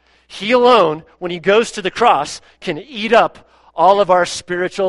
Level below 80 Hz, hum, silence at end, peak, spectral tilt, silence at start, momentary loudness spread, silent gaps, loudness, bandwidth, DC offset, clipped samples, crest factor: -54 dBFS; none; 0 s; 0 dBFS; -4 dB/octave; 0.3 s; 15 LU; none; -15 LUFS; 11.5 kHz; under 0.1%; under 0.1%; 16 dB